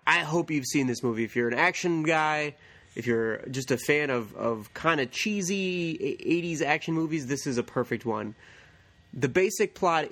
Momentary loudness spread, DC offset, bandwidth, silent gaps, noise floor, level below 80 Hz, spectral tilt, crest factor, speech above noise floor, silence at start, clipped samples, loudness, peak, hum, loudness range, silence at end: 7 LU; under 0.1%; 18 kHz; none; -57 dBFS; -64 dBFS; -4.5 dB/octave; 22 dB; 29 dB; 0.05 s; under 0.1%; -27 LUFS; -6 dBFS; none; 3 LU; 0 s